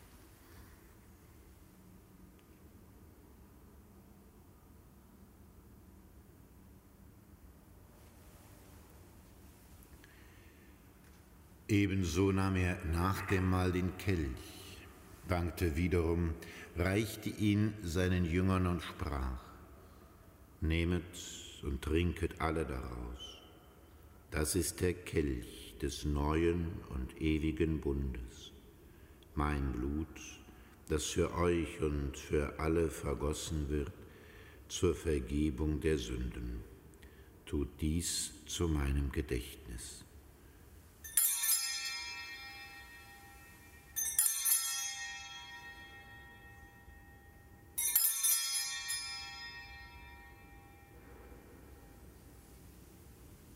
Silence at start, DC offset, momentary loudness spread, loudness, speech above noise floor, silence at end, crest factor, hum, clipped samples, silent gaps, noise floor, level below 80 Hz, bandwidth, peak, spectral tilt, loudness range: 0 s; under 0.1%; 26 LU; -35 LUFS; 25 dB; 0 s; 26 dB; none; under 0.1%; none; -59 dBFS; -48 dBFS; 16 kHz; -12 dBFS; -4.5 dB/octave; 6 LU